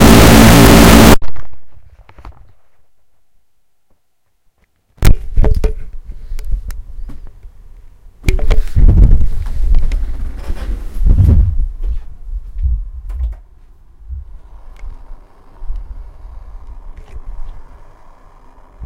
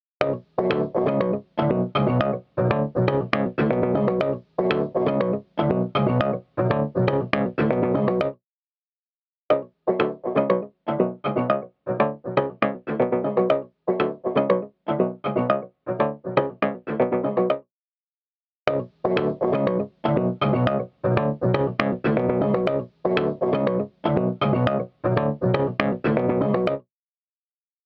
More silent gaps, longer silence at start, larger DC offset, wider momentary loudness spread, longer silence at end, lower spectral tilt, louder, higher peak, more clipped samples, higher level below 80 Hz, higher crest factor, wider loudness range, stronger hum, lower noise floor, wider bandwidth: second, none vs 8.46-9.31 s, 9.37-9.49 s, 17.71-18.66 s; second, 0 s vs 0.2 s; neither; first, 29 LU vs 4 LU; second, 0 s vs 1.05 s; second, -5.5 dB/octave vs -9.5 dB/octave; first, -12 LUFS vs -24 LUFS; about the same, 0 dBFS vs -2 dBFS; first, 2% vs under 0.1%; first, -16 dBFS vs -54 dBFS; second, 12 dB vs 22 dB; first, 22 LU vs 3 LU; neither; second, -67 dBFS vs under -90 dBFS; first, over 20 kHz vs 6 kHz